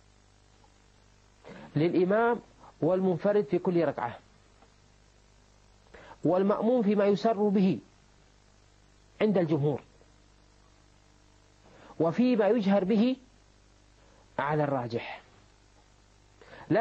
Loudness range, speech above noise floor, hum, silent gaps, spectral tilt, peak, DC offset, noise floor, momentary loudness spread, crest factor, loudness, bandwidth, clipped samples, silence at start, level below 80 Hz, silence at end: 5 LU; 35 dB; 50 Hz at -55 dBFS; none; -8.5 dB/octave; -14 dBFS; under 0.1%; -61 dBFS; 13 LU; 16 dB; -28 LUFS; 8 kHz; under 0.1%; 1.45 s; -64 dBFS; 0 s